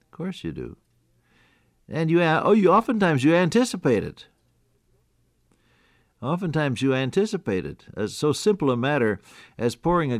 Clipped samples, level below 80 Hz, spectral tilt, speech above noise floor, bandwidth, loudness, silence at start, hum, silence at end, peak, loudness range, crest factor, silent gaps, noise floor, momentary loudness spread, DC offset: under 0.1%; -54 dBFS; -6 dB/octave; 44 dB; 14.5 kHz; -23 LUFS; 0.2 s; none; 0 s; -8 dBFS; 7 LU; 16 dB; none; -66 dBFS; 15 LU; under 0.1%